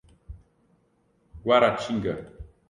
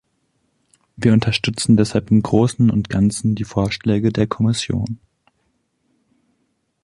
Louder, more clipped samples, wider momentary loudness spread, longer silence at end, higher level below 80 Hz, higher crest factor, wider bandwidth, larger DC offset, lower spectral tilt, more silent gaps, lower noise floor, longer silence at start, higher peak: second, -24 LUFS vs -18 LUFS; neither; first, 16 LU vs 6 LU; second, 0.25 s vs 1.9 s; second, -50 dBFS vs -44 dBFS; first, 22 dB vs 16 dB; about the same, 11 kHz vs 11.5 kHz; neither; about the same, -5.5 dB/octave vs -6 dB/octave; neither; about the same, -67 dBFS vs -68 dBFS; second, 0.3 s vs 1 s; second, -6 dBFS vs -2 dBFS